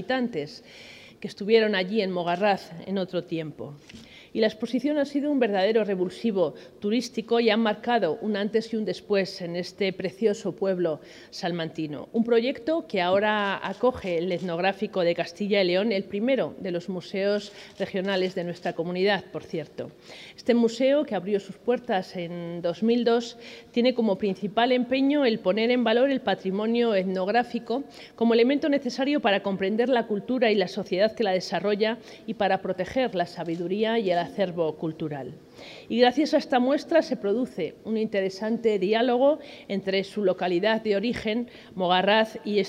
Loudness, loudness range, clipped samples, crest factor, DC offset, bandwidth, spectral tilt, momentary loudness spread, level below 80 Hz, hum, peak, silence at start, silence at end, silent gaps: -26 LUFS; 4 LU; under 0.1%; 18 dB; under 0.1%; 11.5 kHz; -6 dB/octave; 12 LU; -66 dBFS; none; -8 dBFS; 0 s; 0 s; none